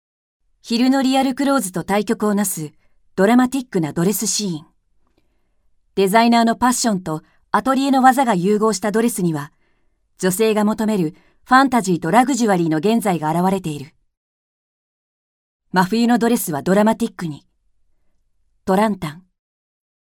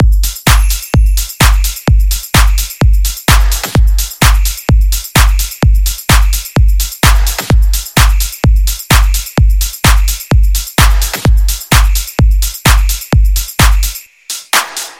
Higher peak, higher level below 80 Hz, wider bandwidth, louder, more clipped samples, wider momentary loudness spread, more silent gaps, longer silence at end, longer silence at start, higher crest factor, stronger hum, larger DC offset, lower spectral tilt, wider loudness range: about the same, 0 dBFS vs 0 dBFS; second, -56 dBFS vs -10 dBFS; first, 19 kHz vs 17 kHz; second, -18 LUFS vs -11 LUFS; second, under 0.1% vs 0.4%; first, 14 LU vs 3 LU; first, 14.17-15.60 s vs none; first, 0.85 s vs 0.1 s; first, 0.65 s vs 0 s; first, 18 dB vs 8 dB; neither; neither; first, -5 dB/octave vs -3.5 dB/octave; first, 5 LU vs 1 LU